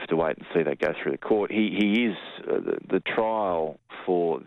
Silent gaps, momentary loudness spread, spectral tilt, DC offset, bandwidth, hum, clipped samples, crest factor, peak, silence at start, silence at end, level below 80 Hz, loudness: none; 7 LU; -7.5 dB/octave; under 0.1%; 8.4 kHz; none; under 0.1%; 14 dB; -12 dBFS; 0 s; 0.05 s; -62 dBFS; -26 LUFS